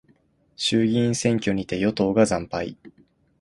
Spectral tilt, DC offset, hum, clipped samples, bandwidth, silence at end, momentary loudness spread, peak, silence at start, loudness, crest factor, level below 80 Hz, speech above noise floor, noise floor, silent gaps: -5 dB/octave; under 0.1%; none; under 0.1%; 11.5 kHz; 0.5 s; 9 LU; -6 dBFS; 0.6 s; -23 LUFS; 18 dB; -52 dBFS; 39 dB; -62 dBFS; none